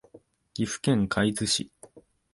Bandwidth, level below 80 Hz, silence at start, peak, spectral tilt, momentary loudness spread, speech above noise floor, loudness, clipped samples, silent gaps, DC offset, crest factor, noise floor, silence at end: 11.5 kHz; -54 dBFS; 0.15 s; -10 dBFS; -4 dB/octave; 14 LU; 30 dB; -27 LUFS; under 0.1%; none; under 0.1%; 20 dB; -56 dBFS; 0.35 s